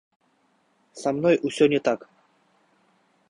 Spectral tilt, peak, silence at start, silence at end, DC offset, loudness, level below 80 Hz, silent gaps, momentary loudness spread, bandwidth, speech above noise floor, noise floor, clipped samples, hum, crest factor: -5.5 dB/octave; -6 dBFS; 0.95 s; 1.35 s; under 0.1%; -23 LUFS; -68 dBFS; none; 10 LU; 11 kHz; 44 dB; -66 dBFS; under 0.1%; none; 20 dB